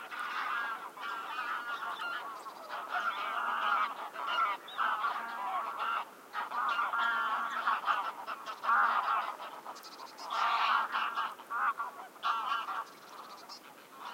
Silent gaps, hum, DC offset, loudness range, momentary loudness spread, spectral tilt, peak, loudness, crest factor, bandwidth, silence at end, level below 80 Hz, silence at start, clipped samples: none; none; under 0.1%; 4 LU; 16 LU; -0.5 dB/octave; -16 dBFS; -34 LUFS; 18 dB; 16 kHz; 0 s; under -90 dBFS; 0 s; under 0.1%